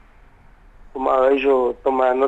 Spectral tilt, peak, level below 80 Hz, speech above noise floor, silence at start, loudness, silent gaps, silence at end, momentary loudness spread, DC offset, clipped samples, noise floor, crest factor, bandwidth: -6 dB/octave; -6 dBFS; -48 dBFS; 31 dB; 0.85 s; -18 LUFS; none; 0 s; 8 LU; under 0.1%; under 0.1%; -48 dBFS; 14 dB; 7.8 kHz